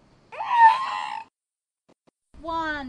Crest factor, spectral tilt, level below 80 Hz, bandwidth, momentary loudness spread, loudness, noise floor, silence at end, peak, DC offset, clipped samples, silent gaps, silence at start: 20 dB; -3 dB/octave; -56 dBFS; 9.8 kHz; 22 LU; -21 LUFS; under -90 dBFS; 0 s; -4 dBFS; under 0.1%; under 0.1%; none; 0.3 s